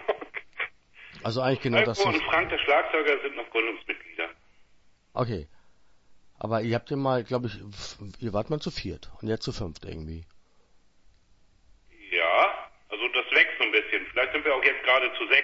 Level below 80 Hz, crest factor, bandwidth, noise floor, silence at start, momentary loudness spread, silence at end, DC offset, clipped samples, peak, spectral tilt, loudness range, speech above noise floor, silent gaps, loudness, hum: -52 dBFS; 22 dB; 8 kHz; -60 dBFS; 0 s; 17 LU; 0 s; under 0.1%; under 0.1%; -6 dBFS; -5 dB/octave; 11 LU; 33 dB; none; -26 LUFS; none